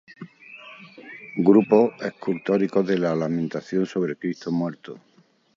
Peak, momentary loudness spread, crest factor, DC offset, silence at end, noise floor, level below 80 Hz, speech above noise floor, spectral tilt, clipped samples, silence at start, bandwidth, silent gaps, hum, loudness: -4 dBFS; 24 LU; 20 dB; under 0.1%; 0.6 s; -45 dBFS; -68 dBFS; 23 dB; -8 dB/octave; under 0.1%; 0.2 s; 7.4 kHz; none; none; -23 LUFS